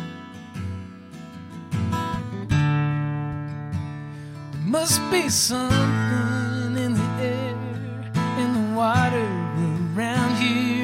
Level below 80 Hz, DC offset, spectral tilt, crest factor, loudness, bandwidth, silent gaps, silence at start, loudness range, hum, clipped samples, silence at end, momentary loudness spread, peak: -48 dBFS; under 0.1%; -5 dB/octave; 16 dB; -23 LUFS; 16.5 kHz; none; 0 s; 5 LU; none; under 0.1%; 0 s; 16 LU; -8 dBFS